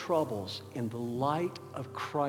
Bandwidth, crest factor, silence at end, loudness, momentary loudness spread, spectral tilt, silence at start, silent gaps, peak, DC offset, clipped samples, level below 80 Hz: 18.5 kHz; 18 dB; 0 s; -35 LUFS; 8 LU; -6.5 dB/octave; 0 s; none; -16 dBFS; under 0.1%; under 0.1%; -76 dBFS